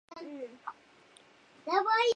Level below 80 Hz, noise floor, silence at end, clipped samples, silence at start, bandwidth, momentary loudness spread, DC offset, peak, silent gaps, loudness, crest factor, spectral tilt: -84 dBFS; -60 dBFS; 0 s; under 0.1%; 0.1 s; 10 kHz; 19 LU; under 0.1%; -14 dBFS; none; -32 LUFS; 20 dB; -1.5 dB/octave